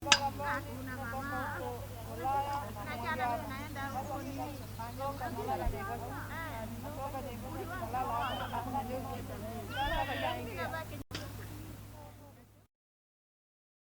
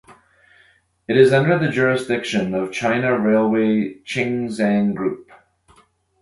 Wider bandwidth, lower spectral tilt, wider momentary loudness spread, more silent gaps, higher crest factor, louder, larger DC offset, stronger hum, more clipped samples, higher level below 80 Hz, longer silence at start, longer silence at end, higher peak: first, over 20 kHz vs 11.5 kHz; second, -3.5 dB/octave vs -6.5 dB/octave; about the same, 9 LU vs 10 LU; neither; first, 30 dB vs 18 dB; second, -38 LUFS vs -19 LUFS; neither; neither; neither; first, -50 dBFS vs -56 dBFS; about the same, 0 s vs 0.1 s; first, 1.2 s vs 1 s; second, -8 dBFS vs -2 dBFS